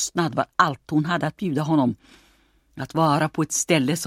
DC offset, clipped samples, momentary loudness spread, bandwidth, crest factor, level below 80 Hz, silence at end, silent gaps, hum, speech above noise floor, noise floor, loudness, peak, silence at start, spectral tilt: under 0.1%; under 0.1%; 6 LU; 16 kHz; 20 dB; -60 dBFS; 0 s; none; none; 38 dB; -60 dBFS; -22 LUFS; -2 dBFS; 0 s; -4.5 dB/octave